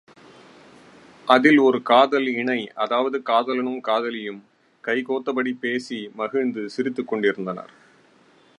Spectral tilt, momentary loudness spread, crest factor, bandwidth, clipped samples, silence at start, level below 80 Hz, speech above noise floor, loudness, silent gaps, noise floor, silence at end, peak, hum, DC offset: -5.5 dB/octave; 15 LU; 22 dB; 11 kHz; under 0.1%; 1.25 s; -78 dBFS; 34 dB; -22 LUFS; none; -56 dBFS; 0.95 s; 0 dBFS; none; under 0.1%